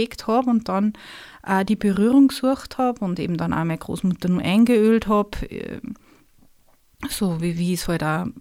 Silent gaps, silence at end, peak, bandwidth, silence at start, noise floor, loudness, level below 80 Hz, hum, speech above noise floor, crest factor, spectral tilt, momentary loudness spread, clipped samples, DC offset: none; 0 s; -6 dBFS; 16.5 kHz; 0 s; -56 dBFS; -21 LUFS; -44 dBFS; none; 36 dB; 14 dB; -6.5 dB/octave; 17 LU; under 0.1%; under 0.1%